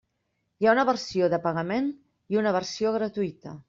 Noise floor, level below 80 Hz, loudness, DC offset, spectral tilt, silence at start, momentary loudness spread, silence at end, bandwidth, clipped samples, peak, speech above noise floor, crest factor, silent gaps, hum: -77 dBFS; -66 dBFS; -26 LUFS; under 0.1%; -5.5 dB/octave; 0.6 s; 8 LU; 0.1 s; 7.6 kHz; under 0.1%; -8 dBFS; 51 dB; 18 dB; none; none